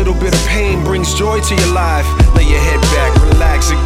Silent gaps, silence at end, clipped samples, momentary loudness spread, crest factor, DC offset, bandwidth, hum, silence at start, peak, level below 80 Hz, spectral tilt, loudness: none; 0 s; under 0.1%; 4 LU; 10 dB; under 0.1%; 15 kHz; none; 0 s; 0 dBFS; -12 dBFS; -5 dB/octave; -12 LUFS